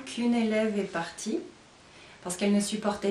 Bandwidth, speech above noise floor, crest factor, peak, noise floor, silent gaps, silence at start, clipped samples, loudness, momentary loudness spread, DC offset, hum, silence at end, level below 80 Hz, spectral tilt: 13.5 kHz; 25 dB; 16 dB; -12 dBFS; -53 dBFS; none; 0 s; under 0.1%; -29 LUFS; 10 LU; under 0.1%; none; 0 s; -66 dBFS; -4.5 dB/octave